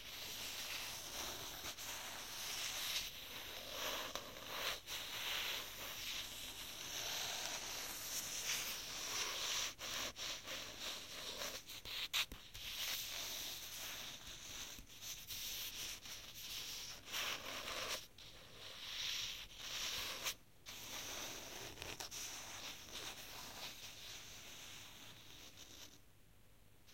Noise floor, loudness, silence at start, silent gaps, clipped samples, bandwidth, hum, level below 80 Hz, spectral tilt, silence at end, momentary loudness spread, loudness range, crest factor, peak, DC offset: -68 dBFS; -44 LUFS; 0 s; none; under 0.1%; 16.5 kHz; none; -68 dBFS; 0 dB/octave; 0 s; 11 LU; 7 LU; 26 dB; -22 dBFS; under 0.1%